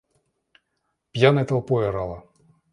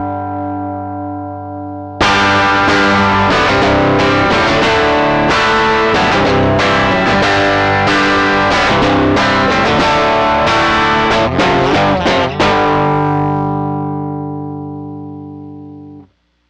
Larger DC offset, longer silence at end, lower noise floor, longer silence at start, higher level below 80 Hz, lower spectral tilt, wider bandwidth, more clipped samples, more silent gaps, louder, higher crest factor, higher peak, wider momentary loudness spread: neither; about the same, 0.55 s vs 0.45 s; first, -76 dBFS vs -45 dBFS; first, 1.15 s vs 0 s; second, -52 dBFS vs -34 dBFS; first, -7.5 dB/octave vs -5 dB/octave; about the same, 11 kHz vs 10 kHz; neither; neither; second, -22 LUFS vs -11 LUFS; first, 22 dB vs 8 dB; about the same, -2 dBFS vs -4 dBFS; about the same, 16 LU vs 14 LU